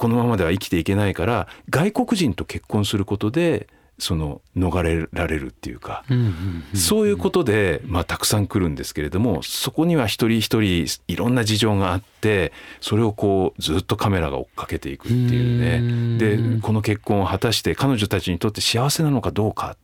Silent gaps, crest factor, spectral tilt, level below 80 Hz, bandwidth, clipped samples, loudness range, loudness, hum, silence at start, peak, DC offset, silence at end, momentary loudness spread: none; 16 dB; -5.5 dB/octave; -42 dBFS; 18.5 kHz; under 0.1%; 3 LU; -21 LUFS; none; 0 s; -6 dBFS; under 0.1%; 0.1 s; 7 LU